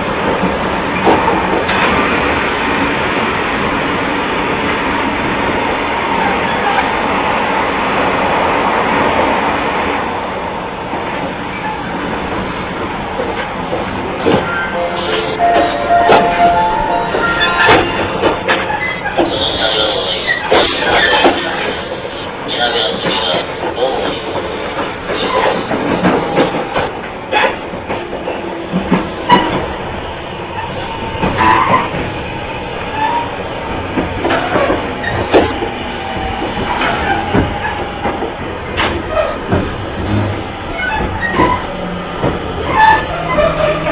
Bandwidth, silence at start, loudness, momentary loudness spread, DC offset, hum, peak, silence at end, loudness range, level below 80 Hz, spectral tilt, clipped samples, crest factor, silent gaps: 4 kHz; 0 s; -14 LUFS; 10 LU; under 0.1%; none; 0 dBFS; 0 s; 5 LU; -32 dBFS; -9 dB/octave; under 0.1%; 14 dB; none